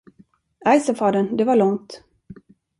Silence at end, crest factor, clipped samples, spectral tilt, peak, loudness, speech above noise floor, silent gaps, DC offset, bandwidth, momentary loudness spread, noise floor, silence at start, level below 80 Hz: 0.45 s; 18 dB; under 0.1%; -6 dB/octave; -4 dBFS; -19 LUFS; 37 dB; none; under 0.1%; 11.5 kHz; 6 LU; -56 dBFS; 0.65 s; -62 dBFS